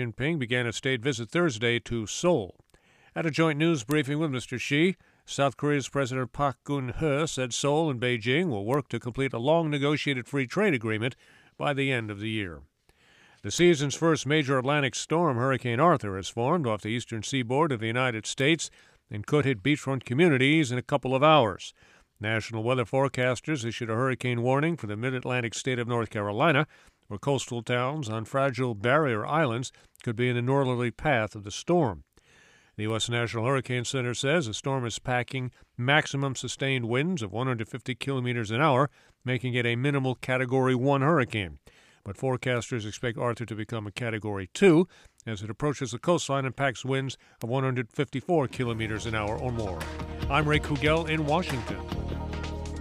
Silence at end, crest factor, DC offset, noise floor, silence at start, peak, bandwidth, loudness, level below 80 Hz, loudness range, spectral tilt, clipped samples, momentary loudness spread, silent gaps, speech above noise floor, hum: 0 s; 20 dB; under 0.1%; -62 dBFS; 0 s; -8 dBFS; 14 kHz; -27 LUFS; -50 dBFS; 4 LU; -5.5 dB/octave; under 0.1%; 11 LU; none; 35 dB; none